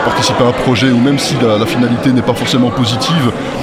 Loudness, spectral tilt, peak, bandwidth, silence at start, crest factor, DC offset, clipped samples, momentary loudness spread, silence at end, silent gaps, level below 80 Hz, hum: -12 LUFS; -5.5 dB/octave; 0 dBFS; 15.5 kHz; 0 s; 12 dB; under 0.1%; under 0.1%; 2 LU; 0 s; none; -38 dBFS; none